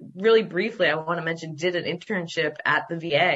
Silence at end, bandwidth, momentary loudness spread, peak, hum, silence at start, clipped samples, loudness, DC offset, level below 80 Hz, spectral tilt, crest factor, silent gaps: 0 s; 8 kHz; 8 LU; -8 dBFS; none; 0 s; under 0.1%; -24 LUFS; under 0.1%; -72 dBFS; -5 dB/octave; 16 dB; none